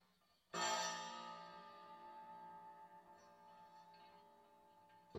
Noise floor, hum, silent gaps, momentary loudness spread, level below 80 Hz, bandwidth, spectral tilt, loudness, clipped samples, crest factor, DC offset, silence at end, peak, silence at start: -78 dBFS; none; none; 26 LU; under -90 dBFS; 16 kHz; -1 dB/octave; -48 LUFS; under 0.1%; 22 dB; under 0.1%; 0 s; -30 dBFS; 0.5 s